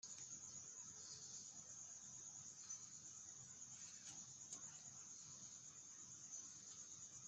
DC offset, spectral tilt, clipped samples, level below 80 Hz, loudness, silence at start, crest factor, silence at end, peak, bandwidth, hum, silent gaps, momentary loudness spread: under 0.1%; -0.5 dB/octave; under 0.1%; under -90 dBFS; -54 LUFS; 0.05 s; 18 dB; 0 s; -40 dBFS; 10 kHz; none; none; 3 LU